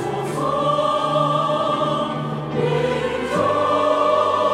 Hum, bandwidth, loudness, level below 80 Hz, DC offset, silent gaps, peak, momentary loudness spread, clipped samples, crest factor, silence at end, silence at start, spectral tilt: none; 13.5 kHz; -20 LUFS; -52 dBFS; under 0.1%; none; -6 dBFS; 6 LU; under 0.1%; 14 dB; 0 s; 0 s; -6 dB/octave